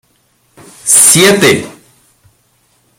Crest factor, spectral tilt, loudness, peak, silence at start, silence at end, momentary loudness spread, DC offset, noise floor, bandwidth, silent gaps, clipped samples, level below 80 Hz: 12 dB; -2 dB/octave; -6 LUFS; 0 dBFS; 0.85 s; 1.25 s; 16 LU; under 0.1%; -55 dBFS; over 20 kHz; none; 0.7%; -50 dBFS